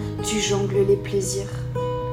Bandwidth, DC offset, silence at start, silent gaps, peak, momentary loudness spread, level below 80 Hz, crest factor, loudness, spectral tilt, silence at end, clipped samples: 15 kHz; under 0.1%; 0 s; none; -8 dBFS; 7 LU; -40 dBFS; 14 dB; -23 LUFS; -4.5 dB/octave; 0 s; under 0.1%